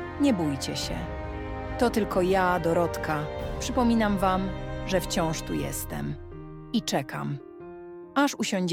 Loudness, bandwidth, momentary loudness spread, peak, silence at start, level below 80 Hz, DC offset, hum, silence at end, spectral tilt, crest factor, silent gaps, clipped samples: -27 LUFS; 17.5 kHz; 12 LU; -10 dBFS; 0 s; -42 dBFS; under 0.1%; none; 0 s; -5 dB/octave; 18 dB; none; under 0.1%